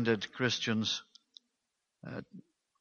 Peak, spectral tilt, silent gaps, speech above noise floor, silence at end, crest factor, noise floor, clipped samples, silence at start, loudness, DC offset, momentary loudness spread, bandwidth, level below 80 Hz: -14 dBFS; -4 dB/octave; none; 51 dB; 0.4 s; 22 dB; -85 dBFS; under 0.1%; 0 s; -34 LUFS; under 0.1%; 18 LU; 7.2 kHz; -74 dBFS